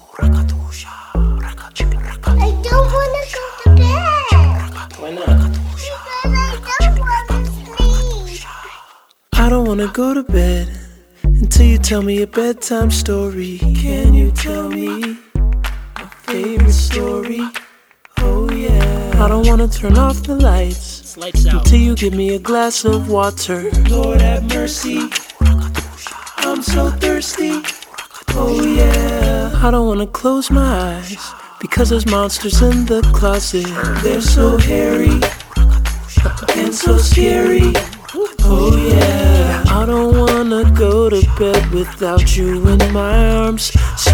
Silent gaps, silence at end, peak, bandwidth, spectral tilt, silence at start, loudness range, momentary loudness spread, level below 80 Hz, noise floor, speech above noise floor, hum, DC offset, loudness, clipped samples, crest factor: none; 0 s; 0 dBFS; 18 kHz; -5.5 dB/octave; 0.15 s; 5 LU; 12 LU; -16 dBFS; -47 dBFS; 34 dB; none; under 0.1%; -15 LUFS; under 0.1%; 12 dB